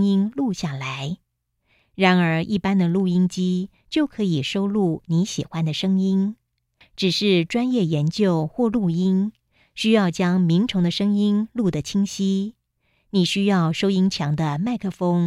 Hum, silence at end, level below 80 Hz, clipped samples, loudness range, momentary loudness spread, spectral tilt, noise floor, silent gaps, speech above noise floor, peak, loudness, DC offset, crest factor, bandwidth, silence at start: none; 0 s; -56 dBFS; under 0.1%; 2 LU; 7 LU; -6.5 dB/octave; -71 dBFS; none; 50 dB; -4 dBFS; -21 LUFS; under 0.1%; 16 dB; 11.5 kHz; 0 s